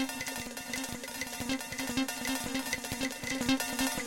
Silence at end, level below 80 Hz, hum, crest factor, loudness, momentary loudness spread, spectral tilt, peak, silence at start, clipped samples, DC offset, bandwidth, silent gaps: 0 s; -56 dBFS; none; 18 dB; -34 LUFS; 7 LU; -2.5 dB/octave; -16 dBFS; 0 s; under 0.1%; under 0.1%; 17 kHz; none